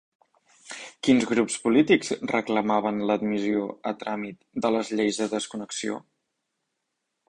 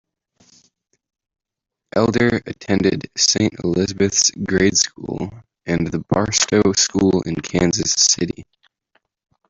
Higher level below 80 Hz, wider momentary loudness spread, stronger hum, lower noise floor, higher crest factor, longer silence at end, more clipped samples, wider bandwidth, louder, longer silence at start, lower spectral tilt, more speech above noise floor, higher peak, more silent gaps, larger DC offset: second, -64 dBFS vs -46 dBFS; about the same, 12 LU vs 10 LU; neither; about the same, -80 dBFS vs -83 dBFS; about the same, 20 dB vs 18 dB; first, 1.3 s vs 1.05 s; neither; first, 10.5 kHz vs 8.2 kHz; second, -25 LUFS vs -17 LUFS; second, 0.65 s vs 1.95 s; about the same, -4.5 dB/octave vs -3.5 dB/octave; second, 56 dB vs 65 dB; second, -6 dBFS vs 0 dBFS; neither; neither